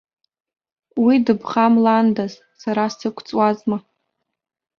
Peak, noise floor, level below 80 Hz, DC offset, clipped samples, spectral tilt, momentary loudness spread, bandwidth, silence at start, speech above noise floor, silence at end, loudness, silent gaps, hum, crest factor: -2 dBFS; -77 dBFS; -64 dBFS; under 0.1%; under 0.1%; -6.5 dB/octave; 13 LU; 6.8 kHz; 0.95 s; 59 dB; 1 s; -18 LUFS; none; none; 18 dB